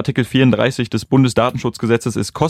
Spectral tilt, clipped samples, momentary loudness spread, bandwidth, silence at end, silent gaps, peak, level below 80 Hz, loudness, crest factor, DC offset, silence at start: -6 dB/octave; under 0.1%; 8 LU; 14.5 kHz; 0 s; none; -2 dBFS; -46 dBFS; -16 LUFS; 14 dB; under 0.1%; 0 s